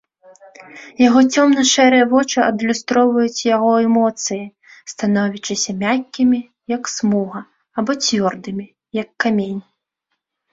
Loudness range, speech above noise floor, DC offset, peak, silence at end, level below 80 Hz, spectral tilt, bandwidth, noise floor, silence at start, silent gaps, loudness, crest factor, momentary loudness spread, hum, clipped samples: 7 LU; 59 dB; under 0.1%; -2 dBFS; 0.9 s; -60 dBFS; -4 dB/octave; 7.8 kHz; -75 dBFS; 0.6 s; none; -16 LUFS; 16 dB; 16 LU; none; under 0.1%